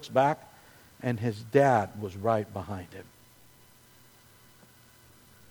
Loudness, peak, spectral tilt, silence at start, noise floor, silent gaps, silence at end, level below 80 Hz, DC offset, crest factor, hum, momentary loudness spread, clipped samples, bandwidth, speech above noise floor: -29 LUFS; -8 dBFS; -7 dB/octave; 0 s; -57 dBFS; none; 2.45 s; -66 dBFS; under 0.1%; 22 dB; none; 17 LU; under 0.1%; over 20 kHz; 30 dB